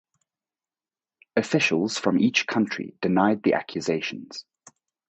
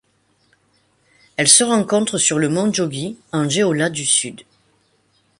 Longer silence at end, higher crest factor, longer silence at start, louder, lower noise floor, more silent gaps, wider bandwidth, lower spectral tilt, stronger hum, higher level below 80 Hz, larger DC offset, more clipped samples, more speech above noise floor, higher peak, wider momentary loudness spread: second, 0.7 s vs 1 s; about the same, 20 dB vs 20 dB; about the same, 1.35 s vs 1.4 s; second, -24 LUFS vs -16 LUFS; first, under -90 dBFS vs -62 dBFS; neither; second, 8.4 kHz vs 11.5 kHz; first, -5 dB/octave vs -3 dB/octave; neither; about the same, -66 dBFS vs -62 dBFS; neither; neither; first, over 66 dB vs 44 dB; second, -6 dBFS vs 0 dBFS; second, 10 LU vs 13 LU